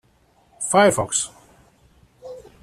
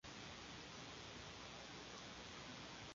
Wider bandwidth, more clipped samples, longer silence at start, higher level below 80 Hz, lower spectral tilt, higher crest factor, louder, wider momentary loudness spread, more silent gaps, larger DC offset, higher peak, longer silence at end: first, 14.5 kHz vs 7.4 kHz; neither; first, 0.6 s vs 0.05 s; first, -56 dBFS vs -70 dBFS; about the same, -3 dB/octave vs -2 dB/octave; about the same, 20 dB vs 16 dB; first, -19 LUFS vs -53 LUFS; first, 24 LU vs 1 LU; neither; neither; first, -2 dBFS vs -40 dBFS; first, 0.25 s vs 0 s